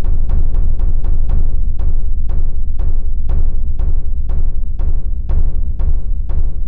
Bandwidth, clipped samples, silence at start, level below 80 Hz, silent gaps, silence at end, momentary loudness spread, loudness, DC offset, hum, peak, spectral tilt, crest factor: 1.2 kHz; under 0.1%; 0 s; -12 dBFS; none; 0 s; 3 LU; -21 LUFS; 10%; none; -2 dBFS; -11.5 dB/octave; 8 dB